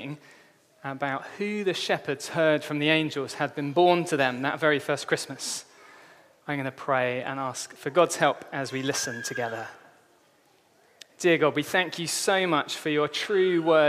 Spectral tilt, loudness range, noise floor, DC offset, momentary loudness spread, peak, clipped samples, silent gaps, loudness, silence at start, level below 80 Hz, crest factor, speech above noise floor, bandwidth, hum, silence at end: -4 dB/octave; 4 LU; -62 dBFS; under 0.1%; 11 LU; -6 dBFS; under 0.1%; none; -26 LUFS; 0 s; -78 dBFS; 22 dB; 36 dB; 15.5 kHz; none; 0 s